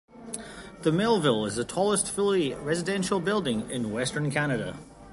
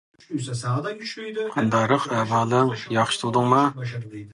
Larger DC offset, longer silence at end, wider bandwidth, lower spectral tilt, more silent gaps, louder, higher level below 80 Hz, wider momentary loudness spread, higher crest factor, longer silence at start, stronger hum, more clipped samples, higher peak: neither; about the same, 0 s vs 0 s; about the same, 12 kHz vs 11.5 kHz; about the same, -4.5 dB/octave vs -5.5 dB/octave; neither; second, -27 LUFS vs -23 LUFS; first, -56 dBFS vs -62 dBFS; about the same, 14 LU vs 12 LU; about the same, 18 dB vs 18 dB; second, 0.15 s vs 0.3 s; neither; neither; second, -10 dBFS vs -4 dBFS